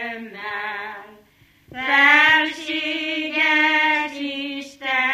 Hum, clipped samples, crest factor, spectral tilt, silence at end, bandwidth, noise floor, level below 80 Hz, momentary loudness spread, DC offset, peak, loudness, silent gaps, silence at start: 50 Hz at -65 dBFS; under 0.1%; 18 dB; -2 dB/octave; 0 s; 15 kHz; -55 dBFS; -64 dBFS; 18 LU; under 0.1%; -2 dBFS; -18 LUFS; none; 0 s